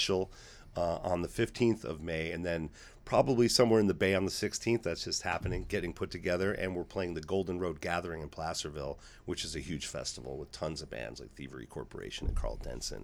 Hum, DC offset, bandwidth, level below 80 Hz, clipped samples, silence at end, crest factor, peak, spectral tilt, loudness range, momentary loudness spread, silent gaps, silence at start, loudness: none; under 0.1%; 16.5 kHz; -48 dBFS; under 0.1%; 0 s; 22 dB; -12 dBFS; -4.5 dB/octave; 10 LU; 15 LU; none; 0 s; -34 LUFS